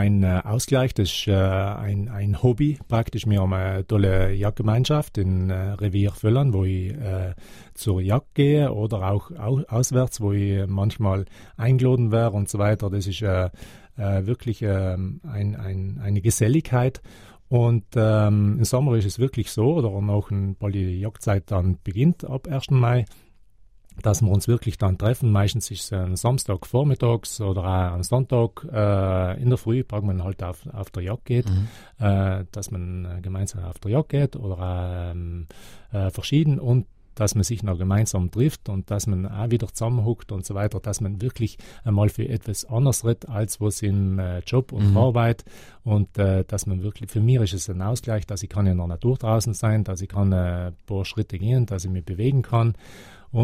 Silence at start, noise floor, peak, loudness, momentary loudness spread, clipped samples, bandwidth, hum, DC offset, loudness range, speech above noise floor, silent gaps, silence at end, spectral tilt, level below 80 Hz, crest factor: 0 s; -51 dBFS; -6 dBFS; -23 LUFS; 9 LU; under 0.1%; 15.5 kHz; none; under 0.1%; 4 LU; 29 dB; none; 0 s; -6.5 dB/octave; -42 dBFS; 16 dB